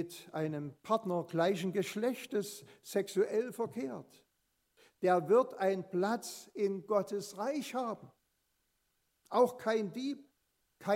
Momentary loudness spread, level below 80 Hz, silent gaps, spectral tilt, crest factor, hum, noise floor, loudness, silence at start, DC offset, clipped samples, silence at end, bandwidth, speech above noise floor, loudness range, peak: 12 LU; -86 dBFS; none; -5.5 dB/octave; 20 dB; none; -80 dBFS; -35 LUFS; 0 s; under 0.1%; under 0.1%; 0 s; 16 kHz; 45 dB; 4 LU; -16 dBFS